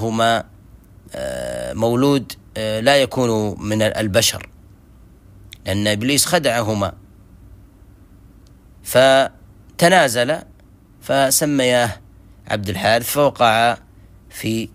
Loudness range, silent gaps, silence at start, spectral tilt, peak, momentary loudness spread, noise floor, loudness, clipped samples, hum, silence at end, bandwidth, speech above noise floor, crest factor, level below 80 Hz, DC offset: 4 LU; none; 0 s; -3.5 dB/octave; 0 dBFS; 14 LU; -47 dBFS; -17 LUFS; under 0.1%; none; 0.05 s; 16 kHz; 30 dB; 18 dB; -48 dBFS; under 0.1%